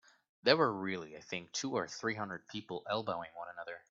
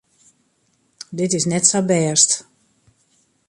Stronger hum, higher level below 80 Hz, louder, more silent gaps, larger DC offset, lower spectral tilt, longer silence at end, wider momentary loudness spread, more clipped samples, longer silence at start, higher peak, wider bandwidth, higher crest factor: neither; second, -78 dBFS vs -64 dBFS; second, -36 LUFS vs -16 LUFS; neither; neither; about the same, -2.5 dB/octave vs -3 dB/octave; second, 0.1 s vs 1.1 s; about the same, 15 LU vs 14 LU; neither; second, 0.45 s vs 1.1 s; second, -10 dBFS vs 0 dBFS; second, 8 kHz vs 11.5 kHz; first, 28 dB vs 22 dB